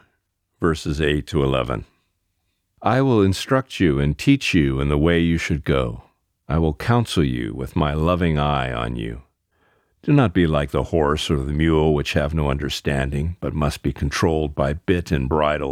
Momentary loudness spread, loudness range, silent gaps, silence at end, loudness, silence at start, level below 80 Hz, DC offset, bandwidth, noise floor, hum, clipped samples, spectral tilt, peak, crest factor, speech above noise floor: 8 LU; 3 LU; none; 0 s; -21 LUFS; 0.6 s; -32 dBFS; under 0.1%; 15.5 kHz; -72 dBFS; none; under 0.1%; -6.5 dB/octave; -4 dBFS; 18 dB; 52 dB